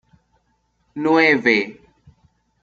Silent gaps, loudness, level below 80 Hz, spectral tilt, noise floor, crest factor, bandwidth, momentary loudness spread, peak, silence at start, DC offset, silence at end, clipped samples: none; -16 LUFS; -62 dBFS; -5.5 dB/octave; -66 dBFS; 20 dB; 7.4 kHz; 17 LU; -2 dBFS; 0.95 s; under 0.1%; 0.9 s; under 0.1%